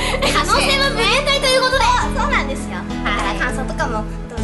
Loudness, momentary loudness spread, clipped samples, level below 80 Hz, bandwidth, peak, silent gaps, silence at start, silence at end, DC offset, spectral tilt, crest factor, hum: -17 LUFS; 10 LU; under 0.1%; -26 dBFS; 12 kHz; -4 dBFS; none; 0 s; 0 s; under 0.1%; -3.5 dB/octave; 14 dB; none